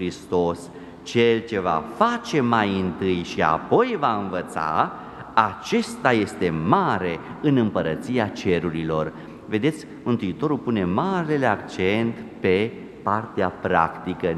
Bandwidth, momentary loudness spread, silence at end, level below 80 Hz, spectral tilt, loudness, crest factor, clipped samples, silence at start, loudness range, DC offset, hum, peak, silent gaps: 12.5 kHz; 7 LU; 0 s; -54 dBFS; -6.5 dB/octave; -23 LUFS; 22 dB; under 0.1%; 0 s; 2 LU; under 0.1%; none; -2 dBFS; none